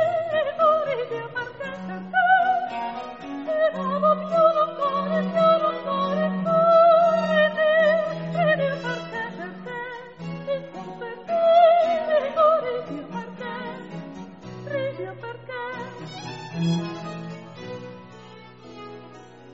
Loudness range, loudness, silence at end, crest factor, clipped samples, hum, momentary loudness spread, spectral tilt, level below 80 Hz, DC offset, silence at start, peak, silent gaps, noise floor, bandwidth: 13 LU; -22 LUFS; 0 s; 18 dB; under 0.1%; none; 19 LU; -4 dB/octave; -64 dBFS; 0.1%; 0 s; -6 dBFS; none; -45 dBFS; 7.8 kHz